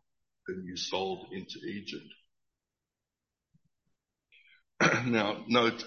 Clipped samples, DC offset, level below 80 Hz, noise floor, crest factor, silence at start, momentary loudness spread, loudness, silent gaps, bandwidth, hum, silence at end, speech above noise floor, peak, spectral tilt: under 0.1%; under 0.1%; -70 dBFS; -90 dBFS; 24 dB; 0.45 s; 16 LU; -31 LUFS; none; 7 kHz; none; 0 s; 57 dB; -10 dBFS; -4.5 dB/octave